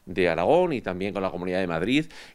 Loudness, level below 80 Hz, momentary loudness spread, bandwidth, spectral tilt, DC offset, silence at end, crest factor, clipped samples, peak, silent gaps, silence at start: -25 LUFS; -52 dBFS; 8 LU; 12.5 kHz; -6.5 dB/octave; under 0.1%; 0.05 s; 16 dB; under 0.1%; -8 dBFS; none; 0.05 s